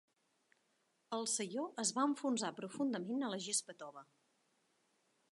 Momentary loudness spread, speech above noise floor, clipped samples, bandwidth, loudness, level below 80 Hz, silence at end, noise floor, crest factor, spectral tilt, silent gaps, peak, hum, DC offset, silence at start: 16 LU; 40 dB; under 0.1%; 11.5 kHz; -39 LUFS; under -90 dBFS; 1.3 s; -80 dBFS; 20 dB; -2.5 dB/octave; none; -22 dBFS; none; under 0.1%; 1.1 s